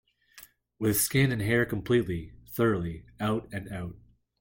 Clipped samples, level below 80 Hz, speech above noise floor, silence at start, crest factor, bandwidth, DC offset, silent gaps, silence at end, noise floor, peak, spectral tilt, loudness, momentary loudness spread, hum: under 0.1%; -54 dBFS; 27 dB; 0.35 s; 18 dB; 17 kHz; under 0.1%; none; 0.45 s; -55 dBFS; -12 dBFS; -5 dB/octave; -28 LUFS; 14 LU; none